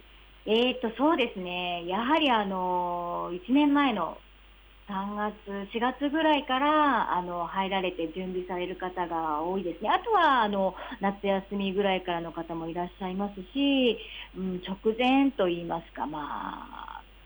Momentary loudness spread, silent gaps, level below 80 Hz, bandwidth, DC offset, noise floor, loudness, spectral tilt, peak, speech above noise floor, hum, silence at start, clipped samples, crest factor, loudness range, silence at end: 12 LU; none; -54 dBFS; over 20 kHz; under 0.1%; -54 dBFS; -28 LUFS; -7 dB/octave; -14 dBFS; 26 dB; none; 0.15 s; under 0.1%; 16 dB; 3 LU; 0.25 s